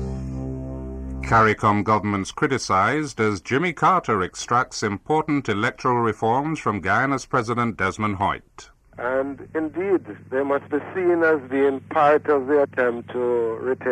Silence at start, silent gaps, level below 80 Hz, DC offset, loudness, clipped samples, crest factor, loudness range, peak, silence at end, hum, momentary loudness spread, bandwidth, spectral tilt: 0 s; none; -44 dBFS; under 0.1%; -22 LUFS; under 0.1%; 16 dB; 4 LU; -6 dBFS; 0 s; none; 10 LU; 11 kHz; -6 dB/octave